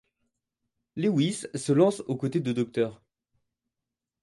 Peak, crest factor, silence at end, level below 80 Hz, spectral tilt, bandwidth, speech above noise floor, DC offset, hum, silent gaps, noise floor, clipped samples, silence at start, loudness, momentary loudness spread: -10 dBFS; 20 dB; 1.3 s; -70 dBFS; -6.5 dB/octave; 11.5 kHz; 62 dB; under 0.1%; none; none; -88 dBFS; under 0.1%; 0.95 s; -27 LUFS; 9 LU